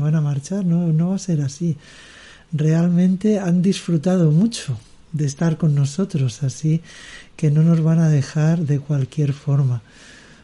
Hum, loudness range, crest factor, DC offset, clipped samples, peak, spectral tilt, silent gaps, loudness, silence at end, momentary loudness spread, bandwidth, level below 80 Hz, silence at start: none; 2 LU; 12 dB; under 0.1%; under 0.1%; -6 dBFS; -7.5 dB/octave; none; -19 LUFS; 0.65 s; 11 LU; 11.5 kHz; -54 dBFS; 0 s